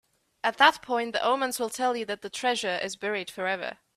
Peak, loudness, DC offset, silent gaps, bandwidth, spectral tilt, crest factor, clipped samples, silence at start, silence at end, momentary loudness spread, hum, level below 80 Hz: -4 dBFS; -27 LUFS; under 0.1%; none; 16 kHz; -2 dB/octave; 24 dB; under 0.1%; 0.45 s; 0.25 s; 10 LU; none; -72 dBFS